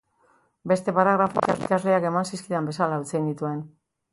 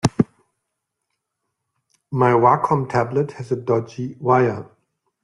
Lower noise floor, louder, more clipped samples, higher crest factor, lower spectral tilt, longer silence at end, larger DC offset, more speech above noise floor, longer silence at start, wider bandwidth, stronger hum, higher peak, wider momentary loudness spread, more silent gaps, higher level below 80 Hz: second, -64 dBFS vs -79 dBFS; second, -24 LUFS vs -19 LUFS; neither; about the same, 20 dB vs 20 dB; about the same, -6.5 dB/octave vs -7 dB/octave; second, 0.45 s vs 0.6 s; neither; second, 40 dB vs 60 dB; first, 0.65 s vs 0.05 s; about the same, 11.5 kHz vs 11.5 kHz; neither; second, -6 dBFS vs 0 dBFS; about the same, 10 LU vs 11 LU; neither; second, -66 dBFS vs -56 dBFS